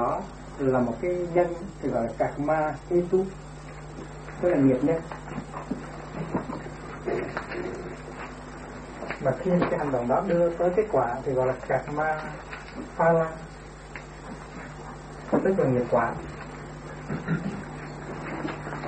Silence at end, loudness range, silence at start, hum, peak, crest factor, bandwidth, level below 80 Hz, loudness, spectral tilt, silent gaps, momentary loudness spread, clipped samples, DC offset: 0 s; 7 LU; 0 s; none; -10 dBFS; 18 dB; 8.8 kHz; -48 dBFS; -27 LUFS; -7.5 dB/octave; none; 17 LU; under 0.1%; under 0.1%